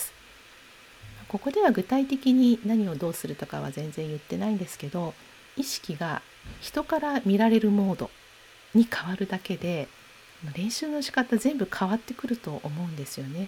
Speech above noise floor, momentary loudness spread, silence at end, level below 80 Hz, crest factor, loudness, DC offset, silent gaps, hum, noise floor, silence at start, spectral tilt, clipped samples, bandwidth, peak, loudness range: 26 dB; 14 LU; 0 s; -60 dBFS; 18 dB; -27 LUFS; under 0.1%; none; none; -52 dBFS; 0 s; -5.5 dB/octave; under 0.1%; 17.5 kHz; -10 dBFS; 7 LU